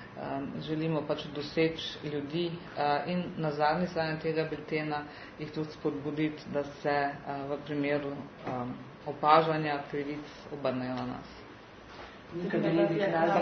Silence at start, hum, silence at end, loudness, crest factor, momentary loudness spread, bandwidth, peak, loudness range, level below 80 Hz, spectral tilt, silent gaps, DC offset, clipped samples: 0 s; none; 0 s; -32 LUFS; 24 dB; 15 LU; 6.4 kHz; -8 dBFS; 3 LU; -62 dBFS; -4.5 dB/octave; none; under 0.1%; under 0.1%